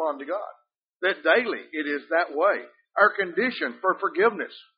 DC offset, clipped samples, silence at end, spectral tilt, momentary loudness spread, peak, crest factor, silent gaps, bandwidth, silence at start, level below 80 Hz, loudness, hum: under 0.1%; under 0.1%; 0.15 s; -1 dB/octave; 11 LU; -4 dBFS; 22 dB; 0.83-1.00 s; 5.2 kHz; 0 s; -78 dBFS; -25 LUFS; none